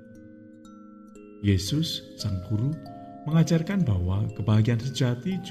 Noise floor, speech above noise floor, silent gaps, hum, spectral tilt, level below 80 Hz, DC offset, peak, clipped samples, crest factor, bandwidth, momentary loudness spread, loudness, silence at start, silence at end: -47 dBFS; 22 dB; none; none; -6.5 dB/octave; -54 dBFS; under 0.1%; -10 dBFS; under 0.1%; 16 dB; 14.5 kHz; 9 LU; -26 LUFS; 0 s; 0 s